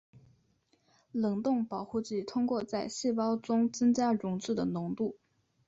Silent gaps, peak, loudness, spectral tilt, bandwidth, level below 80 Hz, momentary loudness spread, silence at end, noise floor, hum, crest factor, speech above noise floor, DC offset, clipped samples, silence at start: none; -18 dBFS; -32 LUFS; -6 dB/octave; 7.8 kHz; -70 dBFS; 8 LU; 0.55 s; -72 dBFS; none; 14 dB; 41 dB; under 0.1%; under 0.1%; 0.15 s